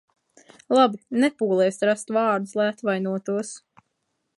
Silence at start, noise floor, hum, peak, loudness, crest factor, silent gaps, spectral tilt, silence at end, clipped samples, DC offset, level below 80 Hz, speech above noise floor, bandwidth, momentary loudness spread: 0.7 s; -76 dBFS; none; -4 dBFS; -23 LUFS; 20 dB; none; -5 dB/octave; 0.8 s; under 0.1%; under 0.1%; -76 dBFS; 54 dB; 11.5 kHz; 9 LU